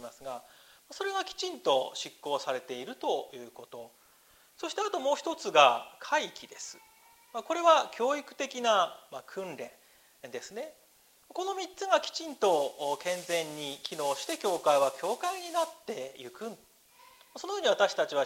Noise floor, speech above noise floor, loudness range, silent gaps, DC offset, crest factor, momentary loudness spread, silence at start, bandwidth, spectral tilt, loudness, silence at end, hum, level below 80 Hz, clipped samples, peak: -63 dBFS; 32 dB; 7 LU; none; under 0.1%; 26 dB; 18 LU; 0 s; 16 kHz; -2 dB/octave; -30 LUFS; 0 s; none; -80 dBFS; under 0.1%; -6 dBFS